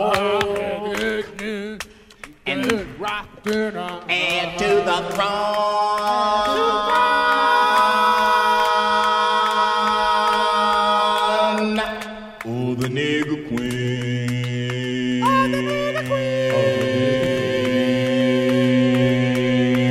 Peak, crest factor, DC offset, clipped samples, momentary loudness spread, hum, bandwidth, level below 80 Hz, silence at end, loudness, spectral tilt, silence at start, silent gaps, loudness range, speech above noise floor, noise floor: -2 dBFS; 18 dB; under 0.1%; under 0.1%; 10 LU; none; 15.5 kHz; -50 dBFS; 0 s; -19 LUFS; -5 dB/octave; 0 s; none; 7 LU; 21 dB; -43 dBFS